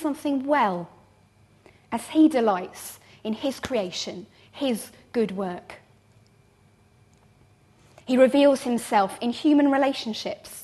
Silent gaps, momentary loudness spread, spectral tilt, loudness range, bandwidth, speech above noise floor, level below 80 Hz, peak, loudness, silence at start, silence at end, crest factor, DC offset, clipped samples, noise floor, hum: none; 17 LU; -4.5 dB/octave; 10 LU; 13 kHz; 35 dB; -64 dBFS; -6 dBFS; -24 LUFS; 0 s; 0 s; 20 dB; under 0.1%; under 0.1%; -59 dBFS; none